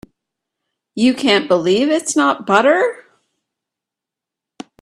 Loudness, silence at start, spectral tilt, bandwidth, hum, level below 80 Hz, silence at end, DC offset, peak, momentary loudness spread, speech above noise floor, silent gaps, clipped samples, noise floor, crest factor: -15 LUFS; 0.95 s; -3.5 dB/octave; 13 kHz; none; -62 dBFS; 1.8 s; under 0.1%; 0 dBFS; 4 LU; 71 dB; none; under 0.1%; -85 dBFS; 18 dB